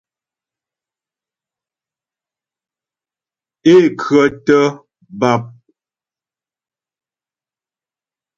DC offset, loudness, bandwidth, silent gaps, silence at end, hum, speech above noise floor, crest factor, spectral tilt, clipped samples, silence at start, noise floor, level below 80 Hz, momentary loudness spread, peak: under 0.1%; -13 LUFS; 7.6 kHz; none; 2.9 s; none; over 78 dB; 18 dB; -6.5 dB/octave; under 0.1%; 3.65 s; under -90 dBFS; -60 dBFS; 9 LU; 0 dBFS